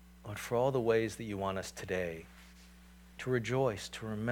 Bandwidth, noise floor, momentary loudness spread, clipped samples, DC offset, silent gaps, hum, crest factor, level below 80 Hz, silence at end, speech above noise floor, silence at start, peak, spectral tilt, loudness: 19 kHz; -57 dBFS; 16 LU; under 0.1%; under 0.1%; none; none; 18 dB; -60 dBFS; 0 s; 22 dB; 0 s; -18 dBFS; -5.5 dB/octave; -35 LUFS